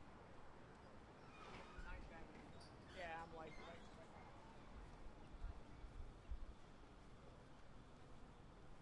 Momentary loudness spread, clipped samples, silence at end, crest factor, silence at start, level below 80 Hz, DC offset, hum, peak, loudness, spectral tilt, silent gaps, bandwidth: 9 LU; under 0.1%; 0 s; 18 dB; 0 s; -60 dBFS; under 0.1%; none; -38 dBFS; -60 LUFS; -5.5 dB/octave; none; 10.5 kHz